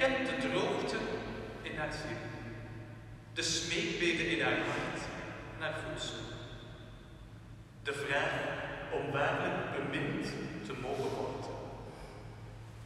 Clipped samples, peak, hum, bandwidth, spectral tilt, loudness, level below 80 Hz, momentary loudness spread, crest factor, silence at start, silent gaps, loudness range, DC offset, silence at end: under 0.1%; -18 dBFS; none; 13.5 kHz; -4 dB/octave; -36 LUFS; -56 dBFS; 18 LU; 20 dB; 0 s; none; 5 LU; under 0.1%; 0 s